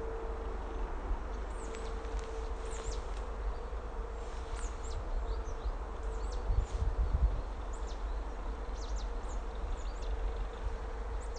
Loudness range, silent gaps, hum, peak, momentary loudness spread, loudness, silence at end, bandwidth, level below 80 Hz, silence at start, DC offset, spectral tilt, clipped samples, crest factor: 3 LU; none; none; -18 dBFS; 6 LU; -41 LUFS; 0 s; 9.2 kHz; -38 dBFS; 0 s; under 0.1%; -5.5 dB/octave; under 0.1%; 18 dB